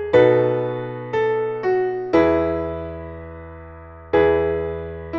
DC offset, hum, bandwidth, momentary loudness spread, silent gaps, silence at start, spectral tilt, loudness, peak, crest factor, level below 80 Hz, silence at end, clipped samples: under 0.1%; none; 6.8 kHz; 21 LU; none; 0 s; -8.5 dB/octave; -20 LUFS; -2 dBFS; 18 dB; -42 dBFS; 0 s; under 0.1%